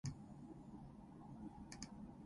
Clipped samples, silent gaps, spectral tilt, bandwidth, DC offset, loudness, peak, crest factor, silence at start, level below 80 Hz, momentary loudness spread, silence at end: under 0.1%; none; -5.5 dB/octave; 11.5 kHz; under 0.1%; -56 LUFS; -32 dBFS; 22 dB; 0.05 s; -66 dBFS; 5 LU; 0 s